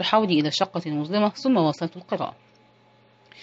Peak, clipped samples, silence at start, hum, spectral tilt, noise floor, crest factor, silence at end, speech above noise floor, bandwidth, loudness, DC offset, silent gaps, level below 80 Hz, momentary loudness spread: -4 dBFS; under 0.1%; 0 s; none; -5.5 dB/octave; -57 dBFS; 20 dB; 0 s; 34 dB; 8 kHz; -24 LUFS; under 0.1%; none; -74 dBFS; 10 LU